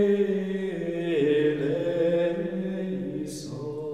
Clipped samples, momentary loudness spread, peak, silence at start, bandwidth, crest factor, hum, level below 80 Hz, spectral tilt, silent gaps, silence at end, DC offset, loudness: under 0.1%; 11 LU; -12 dBFS; 0 s; 13 kHz; 14 dB; none; -62 dBFS; -7 dB/octave; none; 0 s; 0.1%; -27 LUFS